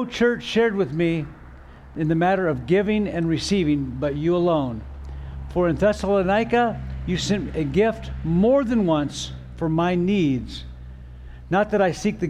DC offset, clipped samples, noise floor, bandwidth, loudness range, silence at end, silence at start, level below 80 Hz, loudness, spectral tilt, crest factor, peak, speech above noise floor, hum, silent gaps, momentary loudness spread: under 0.1%; under 0.1%; -43 dBFS; 11.5 kHz; 2 LU; 0 s; 0 s; -40 dBFS; -22 LUFS; -6.5 dB/octave; 14 dB; -8 dBFS; 21 dB; none; none; 16 LU